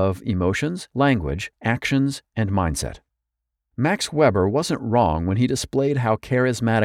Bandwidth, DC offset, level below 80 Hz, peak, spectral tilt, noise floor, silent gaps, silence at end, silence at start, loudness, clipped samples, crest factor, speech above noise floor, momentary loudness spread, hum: 16 kHz; under 0.1%; -40 dBFS; -6 dBFS; -6 dB/octave; -82 dBFS; none; 0 s; 0 s; -22 LUFS; under 0.1%; 16 dB; 61 dB; 7 LU; none